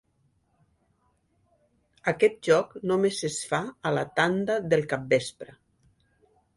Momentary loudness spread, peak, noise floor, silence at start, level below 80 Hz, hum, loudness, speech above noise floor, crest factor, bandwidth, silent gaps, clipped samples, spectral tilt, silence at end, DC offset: 7 LU; -8 dBFS; -70 dBFS; 2.05 s; -66 dBFS; none; -26 LUFS; 44 dB; 20 dB; 11.5 kHz; none; under 0.1%; -4.5 dB/octave; 1.15 s; under 0.1%